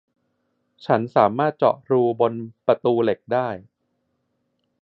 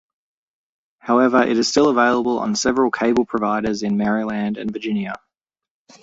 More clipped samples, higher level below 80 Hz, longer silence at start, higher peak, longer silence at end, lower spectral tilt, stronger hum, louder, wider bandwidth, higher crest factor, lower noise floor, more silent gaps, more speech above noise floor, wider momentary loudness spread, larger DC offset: neither; second, -66 dBFS vs -56 dBFS; second, 0.85 s vs 1.05 s; about the same, -2 dBFS vs -2 dBFS; first, 1.2 s vs 0.85 s; first, -9.5 dB/octave vs -4.5 dB/octave; neither; about the same, -21 LUFS vs -19 LUFS; second, 5.8 kHz vs 8 kHz; about the same, 20 dB vs 18 dB; second, -73 dBFS vs -84 dBFS; neither; second, 52 dB vs 66 dB; about the same, 8 LU vs 9 LU; neither